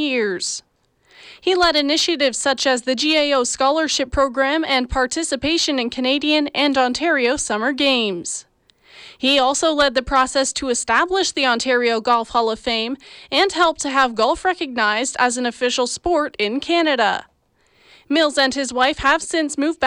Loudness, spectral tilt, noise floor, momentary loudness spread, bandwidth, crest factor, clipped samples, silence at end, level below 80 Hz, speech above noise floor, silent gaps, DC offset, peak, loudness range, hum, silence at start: -18 LUFS; -2 dB/octave; -61 dBFS; 5 LU; 13 kHz; 14 dB; under 0.1%; 0 s; -44 dBFS; 42 dB; none; under 0.1%; -4 dBFS; 2 LU; none; 0 s